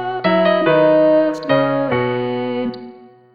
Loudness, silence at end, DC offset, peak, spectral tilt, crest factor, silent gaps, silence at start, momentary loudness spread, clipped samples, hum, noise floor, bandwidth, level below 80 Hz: -16 LUFS; 0.35 s; 0.3%; -2 dBFS; -7.5 dB/octave; 14 dB; none; 0 s; 10 LU; under 0.1%; none; -40 dBFS; 7 kHz; -58 dBFS